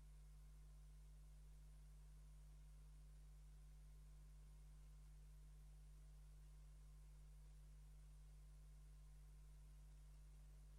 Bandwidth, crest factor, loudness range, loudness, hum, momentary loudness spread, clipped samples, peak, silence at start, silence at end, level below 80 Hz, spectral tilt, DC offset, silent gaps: 12.5 kHz; 6 dB; 0 LU; -66 LUFS; 50 Hz at -65 dBFS; 0 LU; under 0.1%; -56 dBFS; 0 s; 0 s; -62 dBFS; -5.5 dB/octave; under 0.1%; none